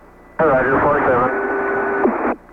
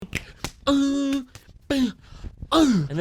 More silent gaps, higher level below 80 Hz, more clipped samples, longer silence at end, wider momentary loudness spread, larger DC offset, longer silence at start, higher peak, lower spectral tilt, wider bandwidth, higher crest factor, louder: neither; about the same, -42 dBFS vs -44 dBFS; neither; first, 0.15 s vs 0 s; second, 5 LU vs 22 LU; neither; first, 0.4 s vs 0 s; about the same, -6 dBFS vs -8 dBFS; first, -9 dB/octave vs -5.5 dB/octave; second, 5.2 kHz vs 15 kHz; about the same, 12 dB vs 16 dB; first, -17 LUFS vs -23 LUFS